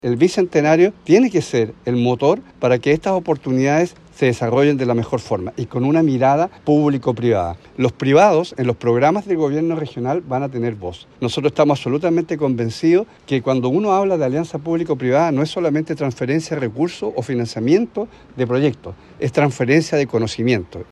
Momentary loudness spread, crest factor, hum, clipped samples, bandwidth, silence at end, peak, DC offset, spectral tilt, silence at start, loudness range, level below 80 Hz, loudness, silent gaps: 8 LU; 16 dB; none; under 0.1%; 11.5 kHz; 0.1 s; -2 dBFS; under 0.1%; -7 dB/octave; 0.05 s; 3 LU; -54 dBFS; -18 LUFS; none